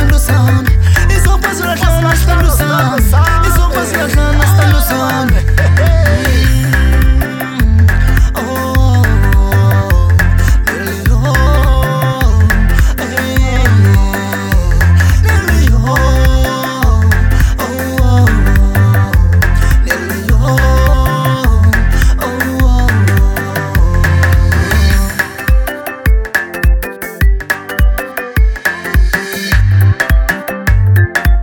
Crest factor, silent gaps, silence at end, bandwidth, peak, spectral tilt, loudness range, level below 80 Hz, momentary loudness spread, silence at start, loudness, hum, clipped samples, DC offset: 8 dB; none; 0 s; 17.5 kHz; 0 dBFS; -5.5 dB/octave; 3 LU; -12 dBFS; 5 LU; 0 s; -11 LUFS; none; under 0.1%; under 0.1%